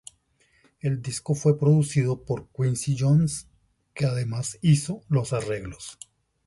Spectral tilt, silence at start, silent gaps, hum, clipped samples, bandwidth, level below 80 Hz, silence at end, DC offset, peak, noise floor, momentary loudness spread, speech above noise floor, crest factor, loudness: -6.5 dB/octave; 0.85 s; none; none; under 0.1%; 11.5 kHz; -54 dBFS; 0.55 s; under 0.1%; -10 dBFS; -65 dBFS; 14 LU; 41 dB; 16 dB; -25 LUFS